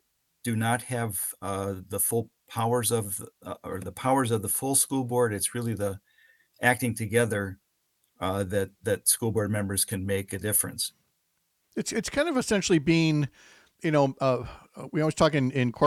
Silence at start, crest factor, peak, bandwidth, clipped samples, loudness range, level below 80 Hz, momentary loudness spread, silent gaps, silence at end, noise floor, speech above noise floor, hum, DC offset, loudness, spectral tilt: 0.45 s; 22 dB; -6 dBFS; 16.5 kHz; under 0.1%; 3 LU; -60 dBFS; 11 LU; none; 0 s; -75 dBFS; 48 dB; none; under 0.1%; -27 LUFS; -4.5 dB/octave